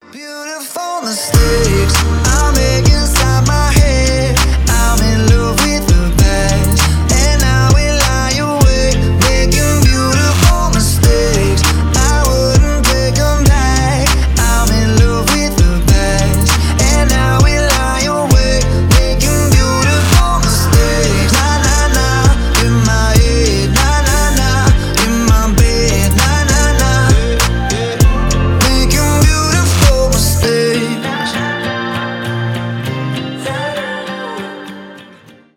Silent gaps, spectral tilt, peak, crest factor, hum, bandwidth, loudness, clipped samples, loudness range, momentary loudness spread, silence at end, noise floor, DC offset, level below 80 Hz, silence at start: none; -4.5 dB/octave; 0 dBFS; 10 dB; none; 19.5 kHz; -12 LUFS; under 0.1%; 2 LU; 8 LU; 0.55 s; -41 dBFS; under 0.1%; -14 dBFS; 0.15 s